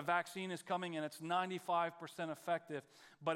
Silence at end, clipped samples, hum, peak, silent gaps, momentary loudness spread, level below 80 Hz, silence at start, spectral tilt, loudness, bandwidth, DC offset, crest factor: 0 s; under 0.1%; none; -22 dBFS; none; 7 LU; under -90 dBFS; 0 s; -4.5 dB/octave; -41 LUFS; 16 kHz; under 0.1%; 20 dB